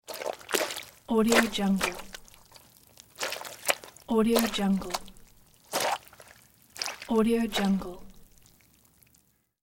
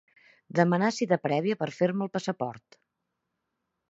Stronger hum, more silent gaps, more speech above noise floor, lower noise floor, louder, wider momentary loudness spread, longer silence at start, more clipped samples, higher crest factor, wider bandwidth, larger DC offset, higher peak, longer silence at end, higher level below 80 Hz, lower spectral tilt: neither; neither; second, 41 dB vs 55 dB; second, -67 dBFS vs -83 dBFS; about the same, -28 LUFS vs -28 LUFS; first, 14 LU vs 8 LU; second, 0.1 s vs 0.55 s; neither; about the same, 26 dB vs 22 dB; first, 17 kHz vs 8 kHz; neither; about the same, -4 dBFS vs -6 dBFS; first, 1.45 s vs 1.3 s; first, -54 dBFS vs -76 dBFS; second, -4 dB/octave vs -6.5 dB/octave